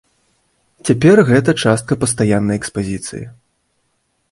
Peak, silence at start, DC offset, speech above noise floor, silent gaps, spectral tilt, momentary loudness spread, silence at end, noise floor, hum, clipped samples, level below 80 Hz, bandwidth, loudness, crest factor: 0 dBFS; 0.85 s; under 0.1%; 52 dB; none; -5.5 dB/octave; 16 LU; 1 s; -66 dBFS; none; under 0.1%; -46 dBFS; 11.5 kHz; -15 LUFS; 16 dB